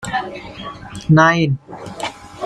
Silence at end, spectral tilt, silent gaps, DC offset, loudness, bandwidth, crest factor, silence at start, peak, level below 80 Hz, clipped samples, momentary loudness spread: 0 s; -6 dB/octave; none; under 0.1%; -17 LUFS; 11.5 kHz; 16 dB; 0 s; -2 dBFS; -46 dBFS; under 0.1%; 20 LU